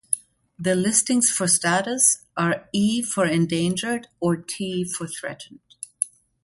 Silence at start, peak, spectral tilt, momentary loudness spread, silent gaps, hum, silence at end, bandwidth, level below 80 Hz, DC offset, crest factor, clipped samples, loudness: 0.1 s; -4 dBFS; -3.5 dB/octave; 12 LU; none; none; 0.35 s; 12 kHz; -64 dBFS; under 0.1%; 20 dB; under 0.1%; -22 LUFS